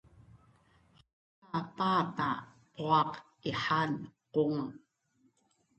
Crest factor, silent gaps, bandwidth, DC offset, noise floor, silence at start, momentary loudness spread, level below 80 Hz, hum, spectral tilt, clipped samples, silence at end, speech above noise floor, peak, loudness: 22 dB; 1.13-1.42 s; 8.6 kHz; under 0.1%; -73 dBFS; 0.35 s; 11 LU; -70 dBFS; none; -6.5 dB/octave; under 0.1%; 1 s; 41 dB; -14 dBFS; -33 LUFS